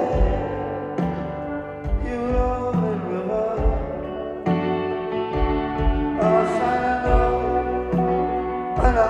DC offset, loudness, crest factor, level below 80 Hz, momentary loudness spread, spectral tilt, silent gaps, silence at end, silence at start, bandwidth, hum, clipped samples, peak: under 0.1%; -23 LUFS; 16 dB; -28 dBFS; 8 LU; -8 dB/octave; none; 0 s; 0 s; 8.6 kHz; none; under 0.1%; -6 dBFS